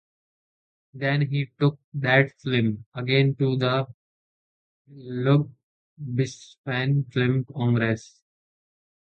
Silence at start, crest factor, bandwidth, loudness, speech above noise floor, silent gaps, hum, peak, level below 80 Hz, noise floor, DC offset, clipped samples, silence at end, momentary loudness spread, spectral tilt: 0.95 s; 22 dB; 8.2 kHz; -24 LUFS; over 66 dB; 1.84-1.92 s, 2.86-2.92 s, 3.94-4.85 s, 5.63-5.97 s, 6.58-6.64 s; none; -4 dBFS; -64 dBFS; under -90 dBFS; under 0.1%; under 0.1%; 1.05 s; 11 LU; -7 dB/octave